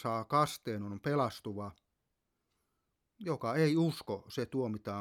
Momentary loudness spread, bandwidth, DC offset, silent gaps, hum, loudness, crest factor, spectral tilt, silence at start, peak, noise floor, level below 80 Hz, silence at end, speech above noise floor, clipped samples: 13 LU; 17 kHz; under 0.1%; none; none; -35 LUFS; 20 dB; -6.5 dB/octave; 0 s; -16 dBFS; -84 dBFS; -72 dBFS; 0 s; 50 dB; under 0.1%